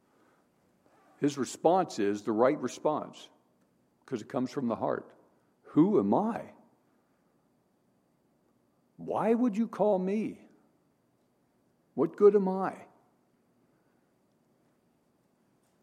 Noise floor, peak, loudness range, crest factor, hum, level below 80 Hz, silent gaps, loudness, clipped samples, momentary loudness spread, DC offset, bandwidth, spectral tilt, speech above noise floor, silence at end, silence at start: -71 dBFS; -10 dBFS; 5 LU; 22 dB; none; -82 dBFS; none; -29 LUFS; under 0.1%; 15 LU; under 0.1%; 11.5 kHz; -7 dB/octave; 43 dB; 3 s; 1.2 s